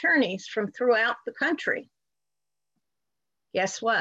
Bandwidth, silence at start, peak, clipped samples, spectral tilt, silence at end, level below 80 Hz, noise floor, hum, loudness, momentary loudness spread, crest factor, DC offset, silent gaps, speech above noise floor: 8.2 kHz; 0 s; -12 dBFS; under 0.1%; -3.5 dB/octave; 0 s; -78 dBFS; -89 dBFS; 50 Hz at -70 dBFS; -26 LUFS; 9 LU; 16 dB; under 0.1%; none; 63 dB